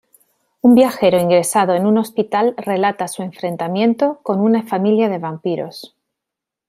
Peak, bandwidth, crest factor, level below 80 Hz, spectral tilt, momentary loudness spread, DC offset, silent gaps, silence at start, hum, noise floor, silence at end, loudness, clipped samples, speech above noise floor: 0 dBFS; 15.5 kHz; 16 dB; -62 dBFS; -5.5 dB/octave; 12 LU; under 0.1%; none; 0.65 s; none; -84 dBFS; 0.8 s; -16 LUFS; under 0.1%; 68 dB